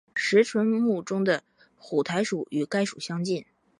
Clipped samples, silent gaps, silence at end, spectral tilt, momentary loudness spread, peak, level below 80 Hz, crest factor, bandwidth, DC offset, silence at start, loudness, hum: under 0.1%; none; 0.35 s; -5 dB/octave; 8 LU; -8 dBFS; -76 dBFS; 18 dB; 11 kHz; under 0.1%; 0.15 s; -26 LUFS; none